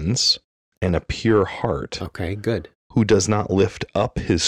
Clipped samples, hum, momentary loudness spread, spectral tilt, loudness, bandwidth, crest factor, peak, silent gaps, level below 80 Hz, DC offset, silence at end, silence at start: under 0.1%; none; 10 LU; -4.5 dB/octave; -21 LUFS; 14 kHz; 14 dB; -6 dBFS; 0.44-0.81 s, 2.75-2.90 s; -40 dBFS; under 0.1%; 0 s; 0 s